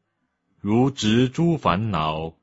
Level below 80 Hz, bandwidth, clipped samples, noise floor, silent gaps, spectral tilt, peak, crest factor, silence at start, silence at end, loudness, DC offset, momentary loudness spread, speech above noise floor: -48 dBFS; 8 kHz; under 0.1%; -74 dBFS; none; -6.5 dB/octave; -4 dBFS; 18 dB; 0.65 s; 0.1 s; -21 LUFS; under 0.1%; 5 LU; 53 dB